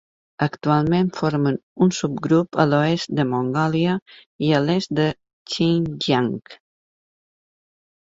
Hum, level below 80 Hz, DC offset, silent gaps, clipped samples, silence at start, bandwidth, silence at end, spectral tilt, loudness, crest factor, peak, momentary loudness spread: none; -56 dBFS; under 0.1%; 1.63-1.76 s, 4.02-4.06 s, 4.26-4.39 s, 5.33-5.46 s; under 0.1%; 0.4 s; 7.8 kHz; 1.5 s; -6.5 dB/octave; -21 LUFS; 20 dB; -2 dBFS; 7 LU